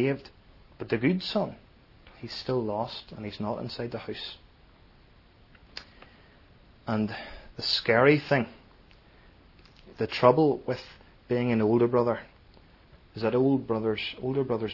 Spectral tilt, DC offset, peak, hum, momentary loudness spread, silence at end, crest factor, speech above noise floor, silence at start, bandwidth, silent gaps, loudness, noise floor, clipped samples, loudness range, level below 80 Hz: -7 dB/octave; under 0.1%; -4 dBFS; none; 22 LU; 0 s; 24 dB; 30 dB; 0 s; 6 kHz; none; -27 LUFS; -57 dBFS; under 0.1%; 12 LU; -58 dBFS